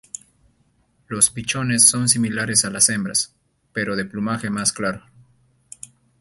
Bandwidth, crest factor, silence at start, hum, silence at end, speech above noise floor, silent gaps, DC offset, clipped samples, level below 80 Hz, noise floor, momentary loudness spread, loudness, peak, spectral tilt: 12 kHz; 22 dB; 1.1 s; none; 1.2 s; 42 dB; none; under 0.1%; under 0.1%; -56 dBFS; -63 dBFS; 23 LU; -18 LUFS; 0 dBFS; -2.5 dB/octave